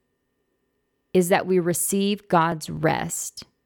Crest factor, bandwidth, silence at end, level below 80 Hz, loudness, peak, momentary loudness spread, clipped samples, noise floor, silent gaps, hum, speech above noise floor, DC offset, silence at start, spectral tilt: 18 dB; 19 kHz; 0.25 s; -58 dBFS; -23 LUFS; -6 dBFS; 7 LU; under 0.1%; -73 dBFS; none; none; 51 dB; under 0.1%; 1.15 s; -4.5 dB/octave